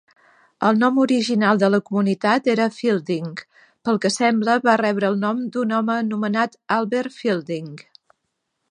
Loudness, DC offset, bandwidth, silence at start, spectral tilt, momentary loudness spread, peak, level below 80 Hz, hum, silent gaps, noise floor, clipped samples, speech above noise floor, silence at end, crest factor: -20 LUFS; under 0.1%; 10 kHz; 0.6 s; -5.5 dB/octave; 9 LU; -2 dBFS; -72 dBFS; none; none; -76 dBFS; under 0.1%; 56 dB; 0.9 s; 20 dB